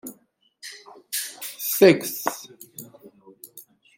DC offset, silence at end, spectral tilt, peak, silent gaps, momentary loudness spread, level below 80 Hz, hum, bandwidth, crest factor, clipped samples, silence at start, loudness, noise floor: under 0.1%; 0.35 s; -4 dB/octave; -2 dBFS; none; 27 LU; -74 dBFS; none; 17 kHz; 24 dB; under 0.1%; 0.05 s; -22 LUFS; -62 dBFS